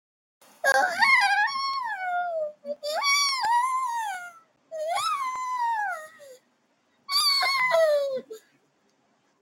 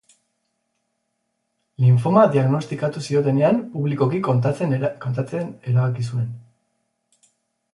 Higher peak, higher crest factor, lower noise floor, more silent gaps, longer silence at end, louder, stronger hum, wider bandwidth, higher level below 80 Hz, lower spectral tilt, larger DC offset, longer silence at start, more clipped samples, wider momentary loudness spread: second, -8 dBFS vs -2 dBFS; about the same, 18 dB vs 20 dB; second, -69 dBFS vs -74 dBFS; neither; second, 1.05 s vs 1.35 s; second, -24 LUFS vs -20 LUFS; neither; first, over 20 kHz vs 11 kHz; second, -82 dBFS vs -62 dBFS; second, 1.5 dB/octave vs -8.5 dB/octave; neither; second, 0.65 s vs 1.8 s; neither; first, 15 LU vs 11 LU